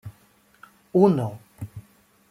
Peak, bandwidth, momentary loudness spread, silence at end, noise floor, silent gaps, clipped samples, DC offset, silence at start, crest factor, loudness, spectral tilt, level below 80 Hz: -4 dBFS; 14.5 kHz; 25 LU; 0.5 s; -59 dBFS; none; under 0.1%; under 0.1%; 0.05 s; 22 dB; -22 LUFS; -9.5 dB/octave; -62 dBFS